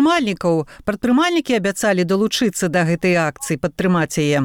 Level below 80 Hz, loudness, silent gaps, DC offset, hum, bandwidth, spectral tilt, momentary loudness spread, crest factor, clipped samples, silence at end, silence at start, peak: -50 dBFS; -18 LUFS; none; under 0.1%; none; 17.5 kHz; -5 dB/octave; 5 LU; 10 dB; under 0.1%; 0 s; 0 s; -8 dBFS